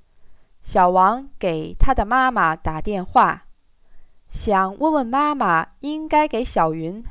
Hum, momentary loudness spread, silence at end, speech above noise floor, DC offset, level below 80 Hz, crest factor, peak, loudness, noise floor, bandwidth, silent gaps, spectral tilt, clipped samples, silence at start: none; 10 LU; 0 s; 27 dB; under 0.1%; -32 dBFS; 16 dB; -4 dBFS; -20 LUFS; -46 dBFS; 4 kHz; none; -10 dB/octave; under 0.1%; 0.25 s